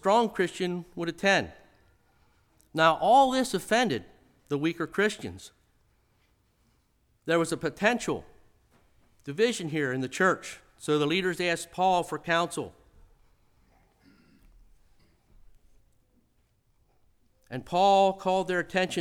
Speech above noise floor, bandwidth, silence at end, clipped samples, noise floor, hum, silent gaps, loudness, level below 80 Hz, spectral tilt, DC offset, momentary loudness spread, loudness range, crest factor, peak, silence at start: 42 dB; 17.5 kHz; 0 s; under 0.1%; -69 dBFS; none; none; -27 LUFS; -62 dBFS; -4.5 dB/octave; under 0.1%; 17 LU; 8 LU; 20 dB; -8 dBFS; 0.05 s